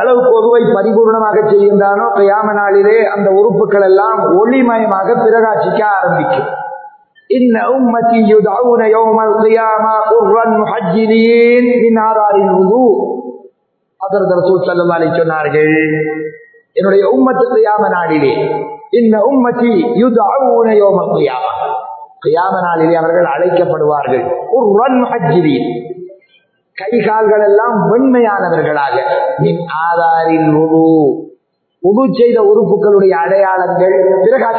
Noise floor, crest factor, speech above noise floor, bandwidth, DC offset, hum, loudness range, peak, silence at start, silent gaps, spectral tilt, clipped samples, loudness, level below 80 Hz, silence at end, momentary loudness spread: -63 dBFS; 10 dB; 54 dB; 4.5 kHz; under 0.1%; none; 3 LU; 0 dBFS; 0 s; none; -11 dB/octave; under 0.1%; -10 LUFS; -58 dBFS; 0 s; 7 LU